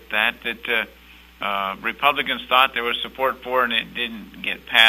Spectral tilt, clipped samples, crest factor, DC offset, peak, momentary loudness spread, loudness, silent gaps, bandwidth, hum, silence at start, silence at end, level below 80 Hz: -2.5 dB/octave; under 0.1%; 22 dB; under 0.1%; 0 dBFS; 11 LU; -22 LUFS; none; 16 kHz; none; 0.1 s; 0 s; -54 dBFS